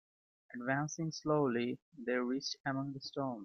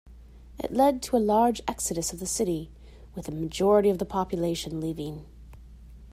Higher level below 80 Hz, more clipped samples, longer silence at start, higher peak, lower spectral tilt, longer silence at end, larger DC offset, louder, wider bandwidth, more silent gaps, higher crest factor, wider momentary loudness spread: second, -78 dBFS vs -48 dBFS; neither; first, 0.5 s vs 0.05 s; second, -20 dBFS vs -10 dBFS; about the same, -5 dB/octave vs -5 dB/octave; about the same, 0 s vs 0 s; neither; second, -37 LUFS vs -27 LUFS; second, 7 kHz vs 16 kHz; first, 1.82-1.92 s, 2.60-2.64 s vs none; about the same, 18 dB vs 18 dB; second, 9 LU vs 15 LU